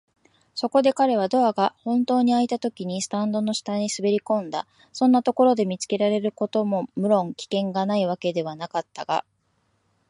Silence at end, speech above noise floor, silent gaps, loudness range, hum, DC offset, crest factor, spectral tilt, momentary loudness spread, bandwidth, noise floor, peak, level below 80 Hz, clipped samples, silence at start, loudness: 0.9 s; 46 dB; none; 3 LU; none; under 0.1%; 18 dB; -5.5 dB/octave; 9 LU; 11 kHz; -69 dBFS; -6 dBFS; -72 dBFS; under 0.1%; 0.55 s; -23 LUFS